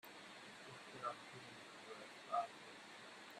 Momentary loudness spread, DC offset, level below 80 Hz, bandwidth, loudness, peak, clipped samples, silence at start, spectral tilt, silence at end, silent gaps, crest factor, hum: 12 LU; under 0.1%; under -90 dBFS; 13.5 kHz; -51 LUFS; -30 dBFS; under 0.1%; 0.05 s; -3 dB/octave; 0 s; none; 22 dB; none